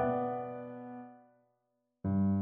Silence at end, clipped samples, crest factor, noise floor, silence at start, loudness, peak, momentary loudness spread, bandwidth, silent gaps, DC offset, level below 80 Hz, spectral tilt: 0 s; under 0.1%; 14 dB; -81 dBFS; 0 s; -36 LUFS; -20 dBFS; 17 LU; 3.5 kHz; none; under 0.1%; -66 dBFS; -10 dB/octave